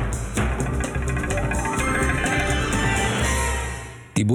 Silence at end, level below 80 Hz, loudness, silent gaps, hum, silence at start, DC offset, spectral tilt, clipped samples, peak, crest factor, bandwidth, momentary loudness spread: 0 s; -28 dBFS; -23 LUFS; none; none; 0 s; under 0.1%; -4.5 dB/octave; under 0.1%; -8 dBFS; 14 dB; 19 kHz; 5 LU